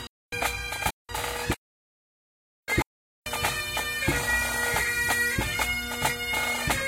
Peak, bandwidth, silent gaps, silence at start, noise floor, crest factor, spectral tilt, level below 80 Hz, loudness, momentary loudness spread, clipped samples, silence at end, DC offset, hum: -10 dBFS; 16.5 kHz; 0.09-0.30 s, 0.93-1.06 s, 1.57-2.63 s, 2.86-3.23 s; 0 s; under -90 dBFS; 20 dB; -2.5 dB/octave; -42 dBFS; -27 LUFS; 9 LU; under 0.1%; 0 s; under 0.1%; none